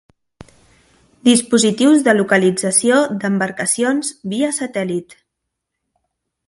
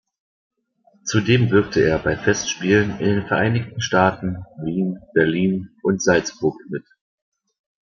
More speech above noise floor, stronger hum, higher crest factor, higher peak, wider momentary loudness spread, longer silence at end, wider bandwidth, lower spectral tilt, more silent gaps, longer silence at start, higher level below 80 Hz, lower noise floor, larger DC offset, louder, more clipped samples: first, 62 dB vs 40 dB; neither; about the same, 18 dB vs 18 dB; about the same, 0 dBFS vs -2 dBFS; second, 8 LU vs 11 LU; first, 1.45 s vs 1 s; first, 11.5 kHz vs 7.4 kHz; second, -3.5 dB/octave vs -5.5 dB/octave; neither; first, 1.25 s vs 1.05 s; second, -60 dBFS vs -48 dBFS; first, -78 dBFS vs -60 dBFS; neither; first, -16 LUFS vs -20 LUFS; neither